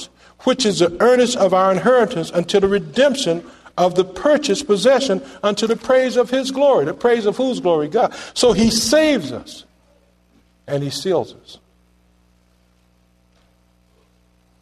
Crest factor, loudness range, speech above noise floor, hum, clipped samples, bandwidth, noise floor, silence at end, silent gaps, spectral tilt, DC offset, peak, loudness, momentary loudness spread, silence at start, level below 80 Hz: 16 dB; 11 LU; 41 dB; 60 Hz at -45 dBFS; under 0.1%; 13.5 kHz; -57 dBFS; 3.05 s; none; -4 dB/octave; under 0.1%; -2 dBFS; -17 LUFS; 9 LU; 0 s; -50 dBFS